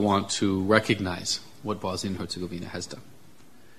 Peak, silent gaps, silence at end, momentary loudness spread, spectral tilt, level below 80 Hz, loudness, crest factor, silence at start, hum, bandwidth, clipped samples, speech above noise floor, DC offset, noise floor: -4 dBFS; none; 0.75 s; 13 LU; -4.5 dB/octave; -58 dBFS; -27 LUFS; 26 dB; 0 s; none; 14 kHz; under 0.1%; 28 dB; 0.4%; -55 dBFS